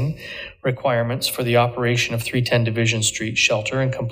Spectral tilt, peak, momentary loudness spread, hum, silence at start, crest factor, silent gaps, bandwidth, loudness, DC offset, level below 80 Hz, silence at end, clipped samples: -4 dB/octave; -2 dBFS; 8 LU; none; 0 s; 18 dB; none; 16.5 kHz; -20 LUFS; under 0.1%; -50 dBFS; 0 s; under 0.1%